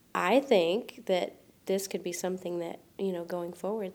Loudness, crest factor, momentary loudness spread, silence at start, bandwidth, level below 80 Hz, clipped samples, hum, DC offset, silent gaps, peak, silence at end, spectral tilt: -31 LUFS; 20 dB; 12 LU; 0.15 s; 20 kHz; -76 dBFS; under 0.1%; none; under 0.1%; none; -12 dBFS; 0 s; -4.5 dB/octave